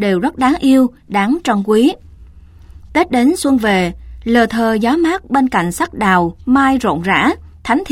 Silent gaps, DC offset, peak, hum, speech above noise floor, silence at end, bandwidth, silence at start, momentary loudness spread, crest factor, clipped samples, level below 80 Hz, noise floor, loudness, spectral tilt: none; under 0.1%; 0 dBFS; none; 25 dB; 0 s; 16 kHz; 0 s; 6 LU; 14 dB; under 0.1%; -38 dBFS; -39 dBFS; -14 LUFS; -5.5 dB/octave